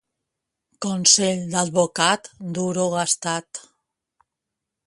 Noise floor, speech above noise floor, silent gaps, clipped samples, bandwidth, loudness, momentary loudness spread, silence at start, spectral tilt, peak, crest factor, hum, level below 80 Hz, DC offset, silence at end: -84 dBFS; 62 dB; none; under 0.1%; 11.5 kHz; -20 LUFS; 16 LU; 0.8 s; -2.5 dB/octave; 0 dBFS; 24 dB; none; -66 dBFS; under 0.1%; 1.25 s